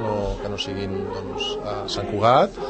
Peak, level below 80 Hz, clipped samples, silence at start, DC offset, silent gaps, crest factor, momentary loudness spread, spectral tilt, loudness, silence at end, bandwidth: -4 dBFS; -40 dBFS; under 0.1%; 0 s; under 0.1%; none; 20 dB; 11 LU; -5.5 dB/octave; -24 LUFS; 0 s; 8.8 kHz